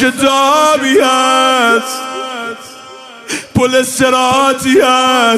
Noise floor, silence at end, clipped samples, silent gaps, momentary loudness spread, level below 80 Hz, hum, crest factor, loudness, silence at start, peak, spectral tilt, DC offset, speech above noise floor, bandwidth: -33 dBFS; 0 s; under 0.1%; none; 14 LU; -48 dBFS; none; 12 dB; -10 LUFS; 0 s; 0 dBFS; -3 dB/octave; under 0.1%; 23 dB; 16 kHz